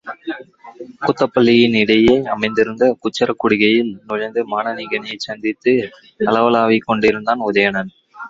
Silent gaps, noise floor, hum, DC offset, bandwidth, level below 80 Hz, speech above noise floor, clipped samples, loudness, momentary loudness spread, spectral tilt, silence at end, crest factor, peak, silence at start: none; -37 dBFS; none; under 0.1%; 7.8 kHz; -50 dBFS; 21 dB; under 0.1%; -16 LUFS; 13 LU; -6 dB/octave; 0 s; 16 dB; -2 dBFS; 0.05 s